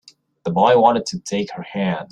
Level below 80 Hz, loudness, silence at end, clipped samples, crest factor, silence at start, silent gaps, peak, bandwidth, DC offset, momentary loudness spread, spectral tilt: -58 dBFS; -18 LUFS; 0.05 s; under 0.1%; 18 dB; 0.45 s; none; -2 dBFS; 11.5 kHz; under 0.1%; 12 LU; -5.5 dB/octave